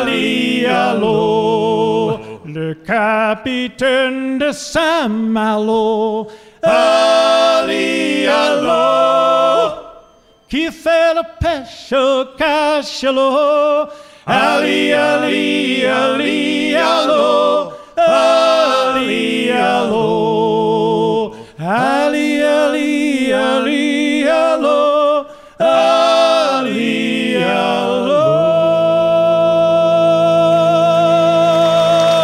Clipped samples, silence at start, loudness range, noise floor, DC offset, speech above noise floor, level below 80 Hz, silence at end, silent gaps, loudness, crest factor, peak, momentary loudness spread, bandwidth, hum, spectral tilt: under 0.1%; 0 s; 4 LU; -48 dBFS; under 0.1%; 34 dB; -46 dBFS; 0 s; none; -14 LUFS; 12 dB; -2 dBFS; 7 LU; 14 kHz; none; -4.5 dB/octave